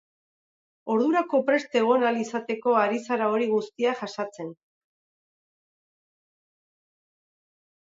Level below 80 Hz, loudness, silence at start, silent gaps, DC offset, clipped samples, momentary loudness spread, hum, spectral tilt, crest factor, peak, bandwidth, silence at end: -80 dBFS; -25 LUFS; 0.85 s; none; under 0.1%; under 0.1%; 11 LU; none; -5 dB/octave; 18 dB; -10 dBFS; 7.8 kHz; 3.4 s